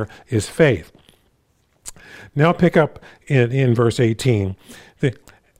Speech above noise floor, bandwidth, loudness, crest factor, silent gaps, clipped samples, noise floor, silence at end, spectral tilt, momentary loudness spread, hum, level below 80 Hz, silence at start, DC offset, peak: 44 dB; 15 kHz; -19 LUFS; 18 dB; none; under 0.1%; -62 dBFS; 0.45 s; -6.5 dB/octave; 21 LU; none; -50 dBFS; 0 s; under 0.1%; -2 dBFS